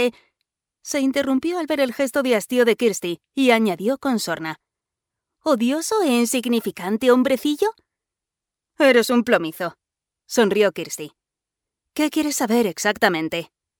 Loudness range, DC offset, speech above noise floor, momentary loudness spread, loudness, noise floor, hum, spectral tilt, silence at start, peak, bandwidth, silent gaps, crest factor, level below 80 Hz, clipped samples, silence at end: 2 LU; under 0.1%; 67 dB; 12 LU; -20 LUFS; -87 dBFS; none; -3.5 dB/octave; 0 s; -2 dBFS; over 20 kHz; none; 18 dB; -66 dBFS; under 0.1%; 0.35 s